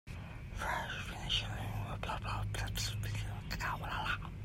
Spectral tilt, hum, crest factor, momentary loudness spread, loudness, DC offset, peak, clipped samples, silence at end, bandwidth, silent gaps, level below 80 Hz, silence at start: -3.5 dB/octave; none; 16 dB; 6 LU; -39 LUFS; under 0.1%; -22 dBFS; under 0.1%; 0 s; 16 kHz; none; -46 dBFS; 0.05 s